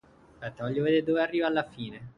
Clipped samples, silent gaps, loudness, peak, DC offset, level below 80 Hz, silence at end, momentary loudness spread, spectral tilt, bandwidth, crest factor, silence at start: under 0.1%; none; -28 LUFS; -12 dBFS; under 0.1%; -64 dBFS; 0.05 s; 15 LU; -8 dB/octave; 9.6 kHz; 18 dB; 0.4 s